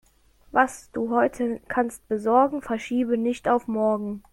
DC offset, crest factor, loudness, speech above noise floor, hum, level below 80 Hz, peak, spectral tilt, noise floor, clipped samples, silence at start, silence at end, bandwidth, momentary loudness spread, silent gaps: under 0.1%; 20 dB; -24 LUFS; 34 dB; none; -58 dBFS; -6 dBFS; -5.5 dB/octave; -58 dBFS; under 0.1%; 0.55 s; 0.15 s; 13 kHz; 7 LU; none